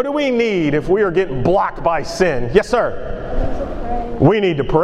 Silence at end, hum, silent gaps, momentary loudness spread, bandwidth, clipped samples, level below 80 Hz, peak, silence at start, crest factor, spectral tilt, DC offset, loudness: 0 s; none; none; 10 LU; 11.5 kHz; under 0.1%; -28 dBFS; 0 dBFS; 0 s; 16 dB; -6.5 dB/octave; under 0.1%; -17 LUFS